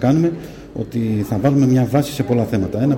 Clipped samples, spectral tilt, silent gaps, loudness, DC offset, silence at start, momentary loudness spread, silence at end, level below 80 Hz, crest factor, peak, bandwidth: under 0.1%; -8 dB/octave; none; -18 LUFS; under 0.1%; 0 s; 12 LU; 0 s; -44 dBFS; 16 dB; -2 dBFS; 17 kHz